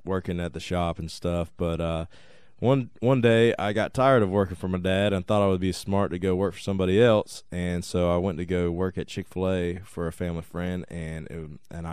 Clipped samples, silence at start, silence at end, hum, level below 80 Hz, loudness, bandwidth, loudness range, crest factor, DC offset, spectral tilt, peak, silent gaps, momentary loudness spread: under 0.1%; 0.05 s; 0 s; none; -46 dBFS; -26 LUFS; 14 kHz; 6 LU; 18 dB; 0.4%; -6.5 dB/octave; -8 dBFS; none; 13 LU